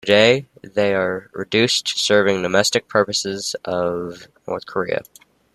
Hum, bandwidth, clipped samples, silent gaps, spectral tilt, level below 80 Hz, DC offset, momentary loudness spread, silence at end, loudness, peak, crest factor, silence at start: none; 14 kHz; under 0.1%; none; -3 dB/octave; -60 dBFS; under 0.1%; 12 LU; 0.5 s; -19 LUFS; -2 dBFS; 18 dB; 0.05 s